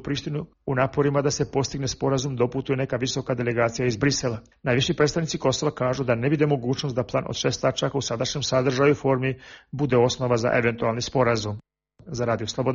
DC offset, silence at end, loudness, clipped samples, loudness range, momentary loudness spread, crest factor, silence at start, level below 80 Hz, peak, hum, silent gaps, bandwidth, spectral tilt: under 0.1%; 0 s; -24 LUFS; under 0.1%; 2 LU; 8 LU; 16 dB; 0 s; -50 dBFS; -8 dBFS; none; none; 7.4 kHz; -5 dB/octave